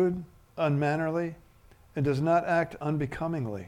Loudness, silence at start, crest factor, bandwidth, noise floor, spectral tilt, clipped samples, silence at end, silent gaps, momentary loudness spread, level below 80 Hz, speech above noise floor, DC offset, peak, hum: -29 LUFS; 0 s; 16 dB; 11.5 kHz; -57 dBFS; -8 dB/octave; under 0.1%; 0 s; none; 12 LU; -56 dBFS; 29 dB; under 0.1%; -12 dBFS; none